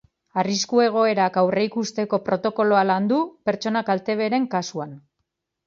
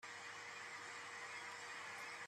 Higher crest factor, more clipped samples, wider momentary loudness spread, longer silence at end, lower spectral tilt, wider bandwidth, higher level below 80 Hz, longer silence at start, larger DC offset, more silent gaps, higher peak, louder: first, 18 dB vs 12 dB; neither; first, 7 LU vs 1 LU; first, 0.7 s vs 0 s; first, -5 dB/octave vs -0.5 dB/octave; second, 7.6 kHz vs 13.5 kHz; first, -68 dBFS vs under -90 dBFS; first, 0.35 s vs 0 s; neither; neither; first, -4 dBFS vs -40 dBFS; first, -22 LUFS vs -50 LUFS